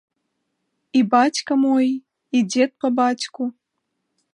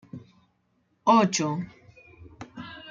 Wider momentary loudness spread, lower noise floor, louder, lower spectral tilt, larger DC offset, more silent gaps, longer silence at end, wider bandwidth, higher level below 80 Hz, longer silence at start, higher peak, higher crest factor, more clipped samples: second, 10 LU vs 25 LU; first, -76 dBFS vs -70 dBFS; first, -20 LUFS vs -24 LUFS; about the same, -4 dB/octave vs -4.5 dB/octave; neither; neither; first, 0.85 s vs 0 s; first, 10.5 kHz vs 9.2 kHz; second, -76 dBFS vs -64 dBFS; first, 0.95 s vs 0.15 s; first, -4 dBFS vs -8 dBFS; about the same, 18 dB vs 20 dB; neither